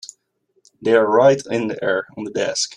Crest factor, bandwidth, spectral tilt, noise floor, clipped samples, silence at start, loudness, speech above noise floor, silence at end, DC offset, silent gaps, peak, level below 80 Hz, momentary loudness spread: 16 dB; 11 kHz; -4 dB/octave; -66 dBFS; under 0.1%; 0.05 s; -18 LUFS; 49 dB; 0 s; under 0.1%; none; -2 dBFS; -64 dBFS; 13 LU